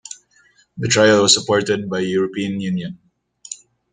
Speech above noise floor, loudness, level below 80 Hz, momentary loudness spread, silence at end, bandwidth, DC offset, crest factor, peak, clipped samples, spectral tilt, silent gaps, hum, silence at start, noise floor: 39 dB; -17 LUFS; -56 dBFS; 22 LU; 0.4 s; 9.8 kHz; under 0.1%; 20 dB; 0 dBFS; under 0.1%; -3.5 dB/octave; none; none; 0.1 s; -56 dBFS